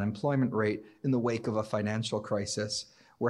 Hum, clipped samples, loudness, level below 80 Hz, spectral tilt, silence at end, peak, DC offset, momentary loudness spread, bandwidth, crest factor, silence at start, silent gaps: none; under 0.1%; -31 LUFS; -70 dBFS; -5.5 dB/octave; 0 s; -16 dBFS; under 0.1%; 6 LU; 12 kHz; 14 dB; 0 s; none